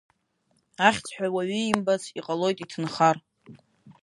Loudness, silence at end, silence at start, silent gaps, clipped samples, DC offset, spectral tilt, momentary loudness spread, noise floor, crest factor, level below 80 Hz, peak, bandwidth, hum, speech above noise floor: -26 LUFS; 0.1 s; 0.8 s; none; under 0.1%; under 0.1%; -4.5 dB/octave; 9 LU; -71 dBFS; 24 dB; -68 dBFS; -2 dBFS; 11.5 kHz; none; 46 dB